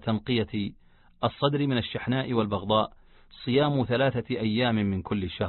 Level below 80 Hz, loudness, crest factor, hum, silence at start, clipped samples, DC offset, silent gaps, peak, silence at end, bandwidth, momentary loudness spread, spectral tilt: -50 dBFS; -27 LUFS; 18 dB; none; 0.05 s; under 0.1%; under 0.1%; none; -8 dBFS; 0 s; 4.4 kHz; 7 LU; -11 dB/octave